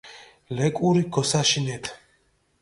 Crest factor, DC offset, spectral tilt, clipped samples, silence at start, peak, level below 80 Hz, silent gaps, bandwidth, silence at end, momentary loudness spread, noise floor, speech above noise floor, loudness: 18 dB; under 0.1%; -4.5 dB/octave; under 0.1%; 0.05 s; -6 dBFS; -58 dBFS; none; 11.5 kHz; 0.65 s; 15 LU; -66 dBFS; 43 dB; -23 LUFS